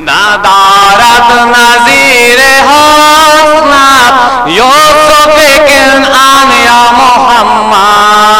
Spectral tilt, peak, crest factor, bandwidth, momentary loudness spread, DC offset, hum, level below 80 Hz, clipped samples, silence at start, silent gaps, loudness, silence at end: -1.5 dB/octave; 0 dBFS; 4 dB; 19.5 kHz; 3 LU; under 0.1%; none; -32 dBFS; 1%; 0 s; none; -2 LUFS; 0 s